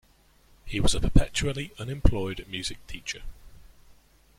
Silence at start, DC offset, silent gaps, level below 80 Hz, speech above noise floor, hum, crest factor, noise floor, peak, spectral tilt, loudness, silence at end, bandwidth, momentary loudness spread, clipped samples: 0.65 s; under 0.1%; none; -32 dBFS; 35 dB; none; 24 dB; -60 dBFS; -4 dBFS; -4.5 dB/octave; -29 LUFS; 0.7 s; 13.5 kHz; 12 LU; under 0.1%